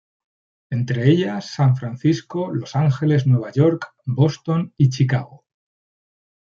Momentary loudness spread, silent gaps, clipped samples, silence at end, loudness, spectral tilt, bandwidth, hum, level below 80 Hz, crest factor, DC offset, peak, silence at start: 8 LU; none; under 0.1%; 1.15 s; -20 LUFS; -8 dB/octave; 7.2 kHz; none; -60 dBFS; 18 dB; under 0.1%; -2 dBFS; 0.7 s